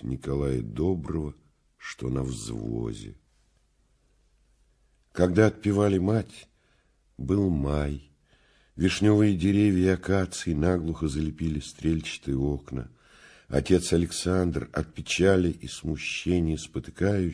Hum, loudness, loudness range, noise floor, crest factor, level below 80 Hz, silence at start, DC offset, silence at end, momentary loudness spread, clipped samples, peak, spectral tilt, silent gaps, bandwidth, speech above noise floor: none; -27 LUFS; 9 LU; -66 dBFS; 22 dB; -42 dBFS; 0 s; under 0.1%; 0 s; 14 LU; under 0.1%; -6 dBFS; -6.5 dB/octave; none; 11 kHz; 41 dB